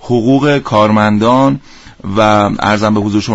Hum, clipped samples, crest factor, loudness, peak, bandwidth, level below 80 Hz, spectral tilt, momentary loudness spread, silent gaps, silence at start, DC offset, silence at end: none; under 0.1%; 10 dB; -11 LUFS; 0 dBFS; 8 kHz; -38 dBFS; -6.5 dB/octave; 5 LU; none; 0.05 s; 0.2%; 0 s